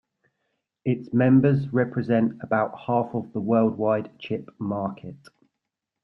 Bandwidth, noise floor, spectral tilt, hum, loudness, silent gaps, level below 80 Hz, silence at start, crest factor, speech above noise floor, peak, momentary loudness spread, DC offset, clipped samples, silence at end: 5.8 kHz; -83 dBFS; -10.5 dB/octave; none; -24 LUFS; none; -62 dBFS; 0.85 s; 18 dB; 60 dB; -8 dBFS; 13 LU; under 0.1%; under 0.1%; 0.9 s